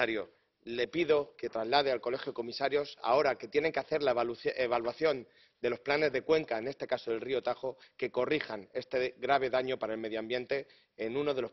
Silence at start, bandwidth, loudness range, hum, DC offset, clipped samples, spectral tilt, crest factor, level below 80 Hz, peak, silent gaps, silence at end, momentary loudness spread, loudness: 0 s; 6.2 kHz; 2 LU; none; under 0.1%; under 0.1%; -2.5 dB/octave; 22 dB; -70 dBFS; -10 dBFS; none; 0 s; 10 LU; -33 LUFS